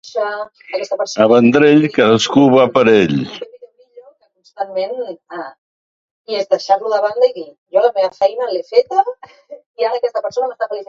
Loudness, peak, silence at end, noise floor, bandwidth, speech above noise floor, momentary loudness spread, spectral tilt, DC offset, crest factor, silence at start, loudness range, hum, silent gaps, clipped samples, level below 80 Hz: -15 LUFS; 0 dBFS; 0.05 s; -50 dBFS; 7.8 kHz; 35 dB; 17 LU; -5.5 dB/octave; under 0.1%; 16 dB; 0.05 s; 10 LU; none; 5.58-6.25 s, 7.58-7.66 s, 9.66-9.74 s; under 0.1%; -58 dBFS